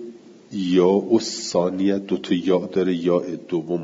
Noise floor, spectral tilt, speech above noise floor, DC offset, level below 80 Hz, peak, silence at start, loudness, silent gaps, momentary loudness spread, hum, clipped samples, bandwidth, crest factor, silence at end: -41 dBFS; -6 dB/octave; 20 dB; under 0.1%; -66 dBFS; -6 dBFS; 0 s; -21 LUFS; none; 9 LU; none; under 0.1%; 7.8 kHz; 16 dB; 0 s